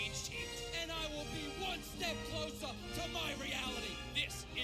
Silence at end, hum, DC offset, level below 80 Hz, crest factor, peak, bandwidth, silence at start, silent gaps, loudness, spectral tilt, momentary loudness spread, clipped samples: 0 s; none; under 0.1%; -54 dBFS; 20 dB; -22 dBFS; 17.5 kHz; 0 s; none; -40 LUFS; -3 dB/octave; 4 LU; under 0.1%